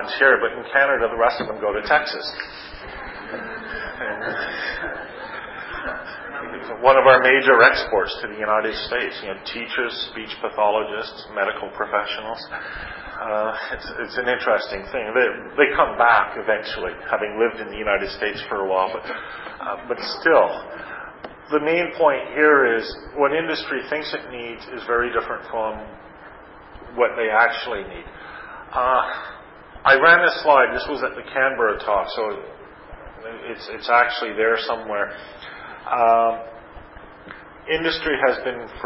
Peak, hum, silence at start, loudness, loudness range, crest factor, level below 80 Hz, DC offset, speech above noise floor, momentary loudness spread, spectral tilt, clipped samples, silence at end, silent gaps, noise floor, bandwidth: 0 dBFS; none; 0 s; -20 LUFS; 9 LU; 22 dB; -50 dBFS; under 0.1%; 22 dB; 18 LU; -7.5 dB/octave; under 0.1%; 0 s; none; -42 dBFS; 5.8 kHz